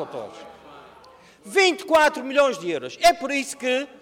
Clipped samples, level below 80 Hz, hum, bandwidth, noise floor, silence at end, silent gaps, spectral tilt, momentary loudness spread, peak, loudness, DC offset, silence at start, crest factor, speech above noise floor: under 0.1%; -58 dBFS; none; 19 kHz; -50 dBFS; 0.15 s; none; -2 dB/octave; 12 LU; -6 dBFS; -21 LUFS; under 0.1%; 0 s; 16 dB; 28 dB